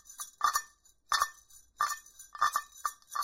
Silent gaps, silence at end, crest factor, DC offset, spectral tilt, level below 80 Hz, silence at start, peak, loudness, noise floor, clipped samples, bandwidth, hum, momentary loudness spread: none; 0 s; 22 dB; under 0.1%; 2.5 dB/octave; -68 dBFS; 0.1 s; -14 dBFS; -33 LUFS; -60 dBFS; under 0.1%; 16 kHz; none; 12 LU